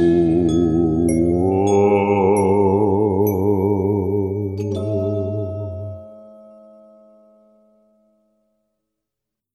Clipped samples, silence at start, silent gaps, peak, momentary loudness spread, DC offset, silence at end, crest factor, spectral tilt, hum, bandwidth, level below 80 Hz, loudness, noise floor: under 0.1%; 0 s; none; -4 dBFS; 10 LU; under 0.1%; 3.25 s; 14 dB; -8 dB/octave; none; 12.5 kHz; -44 dBFS; -18 LUFS; -83 dBFS